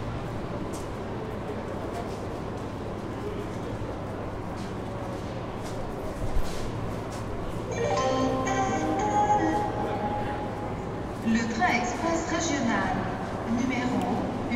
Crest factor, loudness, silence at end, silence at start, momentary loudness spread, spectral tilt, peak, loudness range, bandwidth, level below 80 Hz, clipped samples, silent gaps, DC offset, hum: 16 dB; -30 LUFS; 0 s; 0 s; 10 LU; -5.5 dB/octave; -12 dBFS; 7 LU; 16 kHz; -40 dBFS; under 0.1%; none; under 0.1%; none